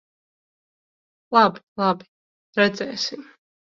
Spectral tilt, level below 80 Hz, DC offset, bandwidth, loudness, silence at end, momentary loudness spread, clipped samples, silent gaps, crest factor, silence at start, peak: -4.5 dB/octave; -70 dBFS; under 0.1%; 7.6 kHz; -22 LUFS; 0.55 s; 12 LU; under 0.1%; 1.63-1.76 s, 2.08-2.53 s; 22 dB; 1.3 s; -2 dBFS